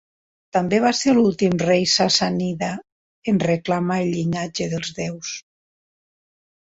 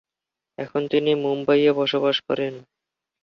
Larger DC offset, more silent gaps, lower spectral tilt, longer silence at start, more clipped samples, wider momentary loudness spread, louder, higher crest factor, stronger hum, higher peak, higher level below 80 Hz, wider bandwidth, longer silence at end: neither; first, 2.92-3.22 s vs none; second, -4.5 dB/octave vs -6.5 dB/octave; about the same, 0.55 s vs 0.6 s; neither; about the same, 11 LU vs 10 LU; about the same, -20 LUFS vs -22 LUFS; about the same, 16 dB vs 16 dB; neither; about the same, -6 dBFS vs -8 dBFS; first, -56 dBFS vs -68 dBFS; first, 8 kHz vs 6.4 kHz; first, 1.25 s vs 0.6 s